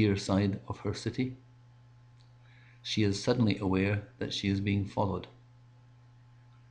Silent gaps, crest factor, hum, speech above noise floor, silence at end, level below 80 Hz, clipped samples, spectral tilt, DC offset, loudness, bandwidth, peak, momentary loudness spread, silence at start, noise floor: none; 18 dB; none; 27 dB; 1.4 s; -60 dBFS; under 0.1%; -6 dB/octave; under 0.1%; -31 LUFS; 10 kHz; -14 dBFS; 9 LU; 0 s; -57 dBFS